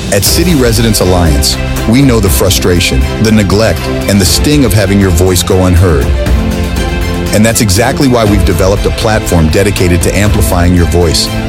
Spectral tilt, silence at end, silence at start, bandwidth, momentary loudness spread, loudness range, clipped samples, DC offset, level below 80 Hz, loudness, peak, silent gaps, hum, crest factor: -5 dB/octave; 0 s; 0 s; 17 kHz; 4 LU; 1 LU; 0.2%; under 0.1%; -16 dBFS; -8 LUFS; 0 dBFS; none; none; 8 dB